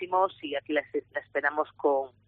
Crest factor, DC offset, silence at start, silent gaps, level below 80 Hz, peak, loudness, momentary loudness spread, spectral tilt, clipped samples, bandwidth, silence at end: 18 dB; under 0.1%; 0 s; none; -74 dBFS; -12 dBFS; -29 LUFS; 7 LU; -1 dB/octave; under 0.1%; 4.5 kHz; 0.2 s